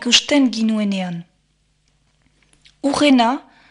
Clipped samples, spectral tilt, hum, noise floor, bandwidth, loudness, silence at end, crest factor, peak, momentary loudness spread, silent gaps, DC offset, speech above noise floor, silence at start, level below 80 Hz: under 0.1%; -3.5 dB/octave; none; -63 dBFS; 11 kHz; -17 LUFS; 0.3 s; 20 dB; 0 dBFS; 15 LU; none; under 0.1%; 47 dB; 0 s; -56 dBFS